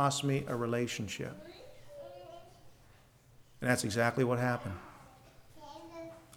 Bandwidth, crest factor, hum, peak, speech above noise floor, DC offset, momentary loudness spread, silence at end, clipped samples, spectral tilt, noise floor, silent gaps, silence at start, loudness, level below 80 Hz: 19.5 kHz; 22 dB; none; -14 dBFS; 29 dB; under 0.1%; 23 LU; 0 s; under 0.1%; -5 dB/octave; -62 dBFS; none; 0 s; -33 LUFS; -66 dBFS